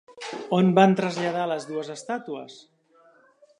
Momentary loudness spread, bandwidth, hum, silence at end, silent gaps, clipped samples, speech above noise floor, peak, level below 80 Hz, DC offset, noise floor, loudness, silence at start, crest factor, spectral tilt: 19 LU; 10.5 kHz; none; 1.05 s; none; under 0.1%; 35 dB; -4 dBFS; -74 dBFS; under 0.1%; -59 dBFS; -24 LUFS; 0.1 s; 22 dB; -6.5 dB/octave